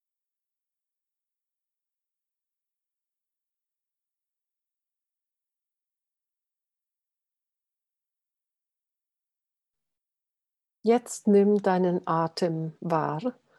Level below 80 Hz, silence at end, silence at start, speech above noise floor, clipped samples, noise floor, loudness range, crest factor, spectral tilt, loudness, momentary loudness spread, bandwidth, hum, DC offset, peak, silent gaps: -82 dBFS; 0.25 s; 10.85 s; 65 dB; under 0.1%; -89 dBFS; 8 LU; 20 dB; -6.5 dB/octave; -26 LUFS; 10 LU; 12.5 kHz; none; under 0.1%; -12 dBFS; none